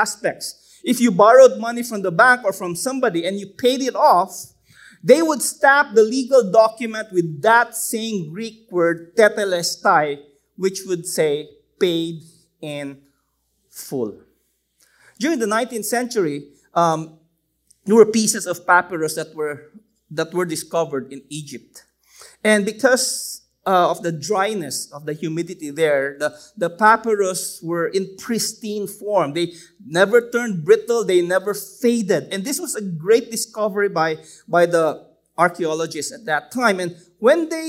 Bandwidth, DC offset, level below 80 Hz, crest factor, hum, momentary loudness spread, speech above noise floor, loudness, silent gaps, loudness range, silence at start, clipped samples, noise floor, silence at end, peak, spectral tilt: 16 kHz; under 0.1%; -68 dBFS; 20 dB; none; 15 LU; 50 dB; -19 LUFS; none; 8 LU; 0 s; under 0.1%; -68 dBFS; 0 s; 0 dBFS; -4 dB/octave